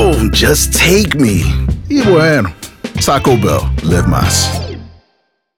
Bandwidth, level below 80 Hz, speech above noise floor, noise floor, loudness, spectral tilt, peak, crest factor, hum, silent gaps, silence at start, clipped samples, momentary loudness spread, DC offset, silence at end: over 20 kHz; -22 dBFS; 51 dB; -61 dBFS; -11 LUFS; -4.5 dB/octave; 0 dBFS; 12 dB; none; none; 0 s; under 0.1%; 12 LU; under 0.1%; 0.7 s